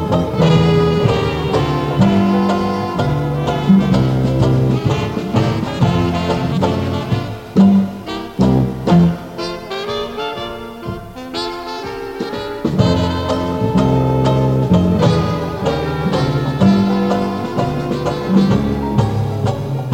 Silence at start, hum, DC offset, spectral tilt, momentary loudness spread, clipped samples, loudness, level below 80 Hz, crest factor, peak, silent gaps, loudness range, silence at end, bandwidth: 0 s; none; 0.2%; -7.5 dB/octave; 11 LU; under 0.1%; -16 LUFS; -34 dBFS; 14 dB; 0 dBFS; none; 5 LU; 0 s; 16 kHz